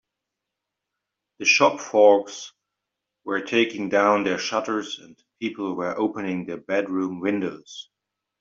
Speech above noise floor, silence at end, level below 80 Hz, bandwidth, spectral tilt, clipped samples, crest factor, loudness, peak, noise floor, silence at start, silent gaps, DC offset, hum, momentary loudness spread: 61 dB; 0.6 s; -72 dBFS; 7.6 kHz; -3.5 dB/octave; under 0.1%; 20 dB; -22 LUFS; -4 dBFS; -84 dBFS; 1.4 s; none; under 0.1%; none; 19 LU